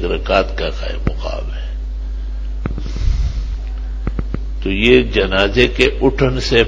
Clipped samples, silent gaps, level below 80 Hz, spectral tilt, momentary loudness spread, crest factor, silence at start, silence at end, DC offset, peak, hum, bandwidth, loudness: under 0.1%; none; -22 dBFS; -6 dB/octave; 14 LU; 16 dB; 0 s; 0 s; under 0.1%; 0 dBFS; none; 8 kHz; -18 LUFS